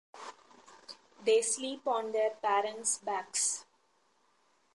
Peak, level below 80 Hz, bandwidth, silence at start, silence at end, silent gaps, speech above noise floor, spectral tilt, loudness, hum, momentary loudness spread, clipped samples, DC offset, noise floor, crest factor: -18 dBFS; -86 dBFS; 11.5 kHz; 0.15 s; 1.1 s; none; 40 dB; 0 dB/octave; -32 LUFS; none; 21 LU; under 0.1%; under 0.1%; -72 dBFS; 18 dB